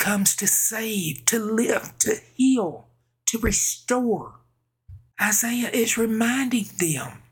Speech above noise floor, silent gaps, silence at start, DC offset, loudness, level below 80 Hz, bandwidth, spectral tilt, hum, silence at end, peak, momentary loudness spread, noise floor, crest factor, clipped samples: 29 dB; none; 0 s; under 0.1%; -22 LUFS; -46 dBFS; 19.5 kHz; -3 dB/octave; none; 0.15 s; -2 dBFS; 7 LU; -52 dBFS; 22 dB; under 0.1%